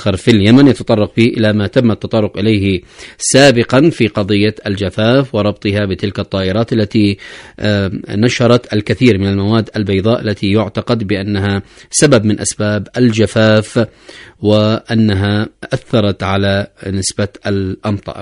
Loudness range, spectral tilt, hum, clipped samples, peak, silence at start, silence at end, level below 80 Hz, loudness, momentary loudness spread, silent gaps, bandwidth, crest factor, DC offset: 3 LU; -5.5 dB/octave; none; 0.2%; 0 dBFS; 0 s; 0 s; -44 dBFS; -13 LUFS; 8 LU; none; 11 kHz; 12 dB; under 0.1%